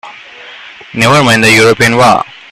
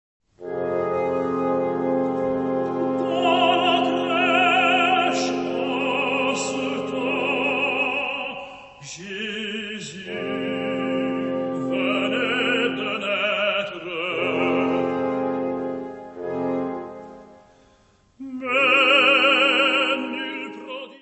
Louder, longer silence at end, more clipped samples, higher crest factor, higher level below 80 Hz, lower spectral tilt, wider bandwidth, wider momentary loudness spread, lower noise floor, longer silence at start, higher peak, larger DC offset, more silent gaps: first, -7 LUFS vs -21 LUFS; first, 0.3 s vs 0.05 s; first, 0.3% vs under 0.1%; second, 10 dB vs 18 dB; first, -42 dBFS vs -64 dBFS; about the same, -4 dB/octave vs -4 dB/octave; first, 16 kHz vs 8.4 kHz; second, 7 LU vs 16 LU; second, -31 dBFS vs -58 dBFS; second, 0.05 s vs 0.4 s; first, 0 dBFS vs -4 dBFS; neither; neither